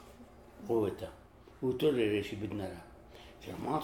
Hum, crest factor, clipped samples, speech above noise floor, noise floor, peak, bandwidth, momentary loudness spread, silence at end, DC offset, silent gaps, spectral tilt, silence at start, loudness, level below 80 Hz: none; 18 dB; under 0.1%; 21 dB; -55 dBFS; -18 dBFS; 18.5 kHz; 24 LU; 0 s; under 0.1%; none; -6.5 dB/octave; 0 s; -35 LUFS; -60 dBFS